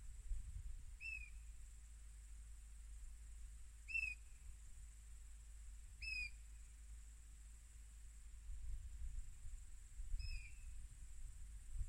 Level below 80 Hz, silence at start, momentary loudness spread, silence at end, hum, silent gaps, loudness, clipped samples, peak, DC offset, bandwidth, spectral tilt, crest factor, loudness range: -54 dBFS; 0 s; 15 LU; 0 s; none; none; -54 LUFS; under 0.1%; -34 dBFS; under 0.1%; 16 kHz; -2 dB/octave; 18 dB; 8 LU